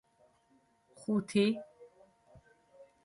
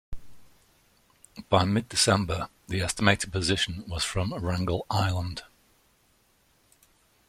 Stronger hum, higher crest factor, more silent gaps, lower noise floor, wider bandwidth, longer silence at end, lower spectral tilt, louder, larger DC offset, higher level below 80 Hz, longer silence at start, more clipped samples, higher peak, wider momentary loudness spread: neither; second, 20 dB vs 26 dB; neither; first, -70 dBFS vs -66 dBFS; second, 11.5 kHz vs 14.5 kHz; second, 0.2 s vs 1.85 s; first, -6 dB/octave vs -4 dB/octave; second, -33 LUFS vs -27 LUFS; neither; second, -74 dBFS vs -48 dBFS; first, 1 s vs 0.1 s; neither; second, -18 dBFS vs -4 dBFS; first, 16 LU vs 10 LU